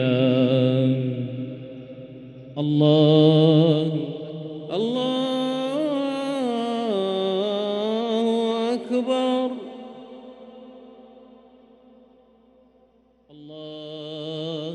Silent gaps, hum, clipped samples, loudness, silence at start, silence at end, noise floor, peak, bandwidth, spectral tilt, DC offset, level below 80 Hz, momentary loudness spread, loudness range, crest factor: none; none; under 0.1%; -22 LUFS; 0 s; 0 s; -59 dBFS; -6 dBFS; 11 kHz; -8 dB/octave; under 0.1%; -70 dBFS; 23 LU; 13 LU; 18 dB